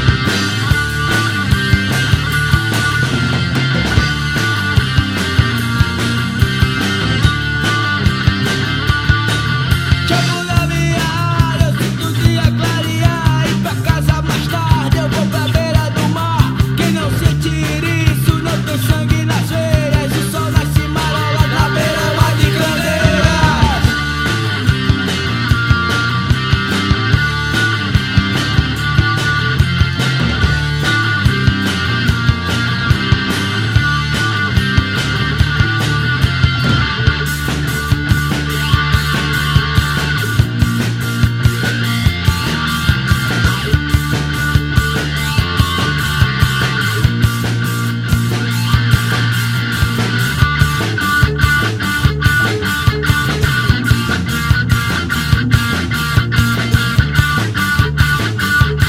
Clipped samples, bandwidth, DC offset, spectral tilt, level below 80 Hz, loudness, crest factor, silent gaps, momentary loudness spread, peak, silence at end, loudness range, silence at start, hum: under 0.1%; 16.5 kHz; under 0.1%; -5 dB/octave; -24 dBFS; -14 LUFS; 14 dB; none; 3 LU; 0 dBFS; 0 s; 1 LU; 0 s; none